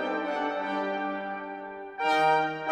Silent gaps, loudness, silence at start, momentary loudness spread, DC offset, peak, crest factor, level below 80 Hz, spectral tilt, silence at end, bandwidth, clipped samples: none; -28 LUFS; 0 s; 14 LU; under 0.1%; -12 dBFS; 16 dB; -72 dBFS; -5 dB/octave; 0 s; 11 kHz; under 0.1%